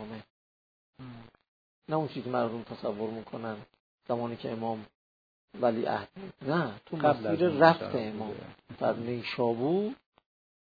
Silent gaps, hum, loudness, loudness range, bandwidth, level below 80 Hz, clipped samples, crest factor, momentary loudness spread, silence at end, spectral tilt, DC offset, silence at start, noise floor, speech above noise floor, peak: 0.30-0.93 s, 1.48-1.82 s, 3.80-3.98 s, 4.95-5.48 s; none; -31 LUFS; 8 LU; 5 kHz; -70 dBFS; under 0.1%; 26 dB; 18 LU; 0.65 s; -5 dB/octave; under 0.1%; 0 s; under -90 dBFS; over 60 dB; -6 dBFS